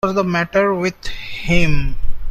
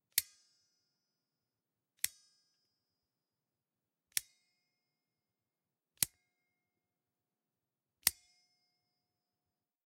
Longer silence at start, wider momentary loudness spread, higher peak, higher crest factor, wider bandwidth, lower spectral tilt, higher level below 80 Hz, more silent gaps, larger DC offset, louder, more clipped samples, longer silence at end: about the same, 0.05 s vs 0.15 s; first, 12 LU vs 5 LU; first, -2 dBFS vs -6 dBFS; second, 14 dB vs 40 dB; second, 7.6 kHz vs 16 kHz; first, -6 dB/octave vs 1.5 dB/octave; first, -24 dBFS vs -78 dBFS; neither; neither; first, -19 LUFS vs -37 LUFS; neither; second, 0 s vs 1.75 s